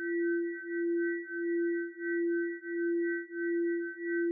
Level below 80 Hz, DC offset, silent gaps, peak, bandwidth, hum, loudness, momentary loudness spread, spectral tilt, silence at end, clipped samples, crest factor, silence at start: under -90 dBFS; under 0.1%; none; -24 dBFS; 2.1 kHz; none; -33 LUFS; 4 LU; 1 dB/octave; 0 s; under 0.1%; 8 dB; 0 s